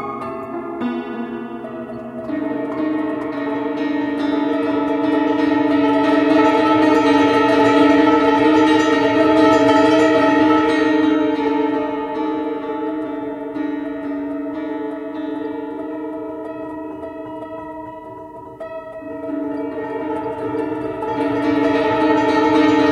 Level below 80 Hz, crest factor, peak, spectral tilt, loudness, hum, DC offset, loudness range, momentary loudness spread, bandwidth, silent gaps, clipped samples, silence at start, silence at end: -52 dBFS; 16 dB; 0 dBFS; -6 dB/octave; -17 LUFS; none; under 0.1%; 15 LU; 16 LU; 9.2 kHz; none; under 0.1%; 0 s; 0 s